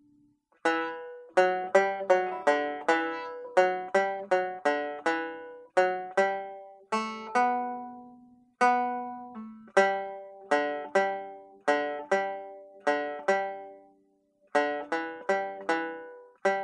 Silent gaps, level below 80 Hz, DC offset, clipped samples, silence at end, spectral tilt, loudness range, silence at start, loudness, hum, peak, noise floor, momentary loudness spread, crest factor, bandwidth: none; -80 dBFS; under 0.1%; under 0.1%; 0 s; -4 dB/octave; 4 LU; 0.65 s; -29 LUFS; none; -8 dBFS; -68 dBFS; 16 LU; 20 dB; 10.5 kHz